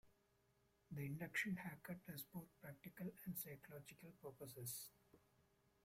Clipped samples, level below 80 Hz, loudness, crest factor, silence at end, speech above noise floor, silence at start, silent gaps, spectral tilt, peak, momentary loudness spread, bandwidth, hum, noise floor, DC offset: under 0.1%; -80 dBFS; -52 LUFS; 22 dB; 0.65 s; 28 dB; 0.05 s; none; -4.5 dB/octave; -32 dBFS; 14 LU; 16.5 kHz; none; -81 dBFS; under 0.1%